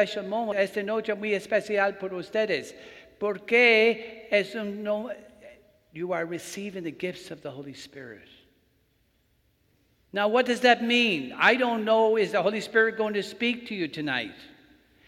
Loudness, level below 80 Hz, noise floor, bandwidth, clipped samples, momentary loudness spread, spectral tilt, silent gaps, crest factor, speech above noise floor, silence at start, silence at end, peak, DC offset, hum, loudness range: -25 LUFS; -70 dBFS; -68 dBFS; 15 kHz; under 0.1%; 18 LU; -4 dB/octave; none; 22 dB; 42 dB; 0 s; 0.6 s; -4 dBFS; under 0.1%; none; 13 LU